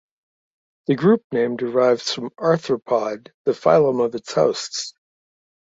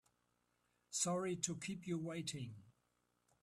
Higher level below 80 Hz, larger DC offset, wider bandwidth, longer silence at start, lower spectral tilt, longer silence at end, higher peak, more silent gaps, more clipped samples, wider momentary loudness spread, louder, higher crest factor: first, -64 dBFS vs -80 dBFS; neither; second, 8 kHz vs 14 kHz; about the same, 0.9 s vs 0.9 s; about the same, -5 dB/octave vs -4 dB/octave; first, 0.9 s vs 0.7 s; first, -2 dBFS vs -22 dBFS; first, 1.24-1.30 s, 3.34-3.45 s vs none; neither; about the same, 11 LU vs 12 LU; first, -20 LUFS vs -42 LUFS; second, 18 dB vs 24 dB